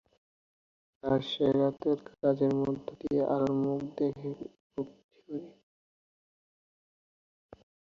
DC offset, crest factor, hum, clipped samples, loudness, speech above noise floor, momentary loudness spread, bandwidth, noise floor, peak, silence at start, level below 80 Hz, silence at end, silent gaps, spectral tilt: under 0.1%; 18 dB; none; under 0.1%; -31 LUFS; over 60 dB; 15 LU; 7 kHz; under -90 dBFS; -14 dBFS; 1.05 s; -66 dBFS; 2.45 s; 4.60-4.70 s, 5.04-5.09 s; -8.5 dB/octave